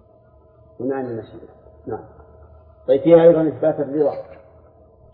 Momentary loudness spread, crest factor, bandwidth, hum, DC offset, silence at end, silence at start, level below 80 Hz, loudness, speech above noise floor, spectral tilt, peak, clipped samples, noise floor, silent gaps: 22 LU; 20 dB; 4.2 kHz; none; under 0.1%; 0.8 s; 0.8 s; -54 dBFS; -17 LUFS; 34 dB; -12 dB/octave; 0 dBFS; under 0.1%; -51 dBFS; none